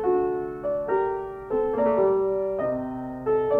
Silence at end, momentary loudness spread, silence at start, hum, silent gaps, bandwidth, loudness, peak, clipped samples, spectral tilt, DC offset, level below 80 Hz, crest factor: 0 s; 8 LU; 0 s; none; none; 3.7 kHz; -26 LUFS; -12 dBFS; under 0.1%; -9.5 dB/octave; under 0.1%; -52 dBFS; 14 dB